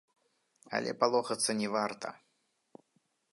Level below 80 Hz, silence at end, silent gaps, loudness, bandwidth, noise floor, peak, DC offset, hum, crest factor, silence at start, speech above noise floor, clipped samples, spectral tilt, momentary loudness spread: -84 dBFS; 1.15 s; none; -32 LUFS; 11.5 kHz; -77 dBFS; -12 dBFS; under 0.1%; none; 24 dB; 0.7 s; 45 dB; under 0.1%; -3 dB/octave; 10 LU